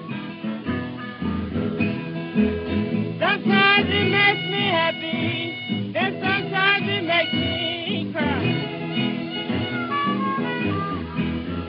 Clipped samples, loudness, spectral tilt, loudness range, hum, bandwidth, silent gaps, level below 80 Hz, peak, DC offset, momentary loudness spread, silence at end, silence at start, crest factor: under 0.1%; -22 LUFS; -10 dB/octave; 5 LU; none; 5.6 kHz; none; -48 dBFS; -4 dBFS; under 0.1%; 10 LU; 0 s; 0 s; 18 dB